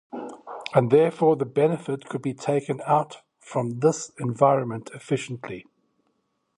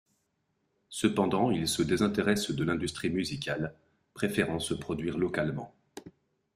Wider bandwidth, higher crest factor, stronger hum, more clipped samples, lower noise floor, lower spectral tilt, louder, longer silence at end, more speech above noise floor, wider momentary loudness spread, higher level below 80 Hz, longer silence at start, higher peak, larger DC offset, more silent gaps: second, 11.5 kHz vs 15.5 kHz; about the same, 20 dB vs 20 dB; neither; neither; second, -73 dBFS vs -77 dBFS; first, -6.5 dB/octave vs -5 dB/octave; first, -24 LUFS vs -30 LUFS; first, 0.95 s vs 0.45 s; about the same, 50 dB vs 47 dB; first, 17 LU vs 13 LU; second, -68 dBFS vs -58 dBFS; second, 0.15 s vs 0.9 s; first, -4 dBFS vs -12 dBFS; neither; neither